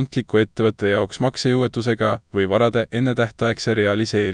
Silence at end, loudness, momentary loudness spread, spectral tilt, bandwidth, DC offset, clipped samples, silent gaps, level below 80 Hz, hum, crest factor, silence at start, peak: 0 s; -20 LUFS; 3 LU; -6 dB/octave; 10.5 kHz; under 0.1%; under 0.1%; none; -52 dBFS; none; 16 dB; 0 s; -4 dBFS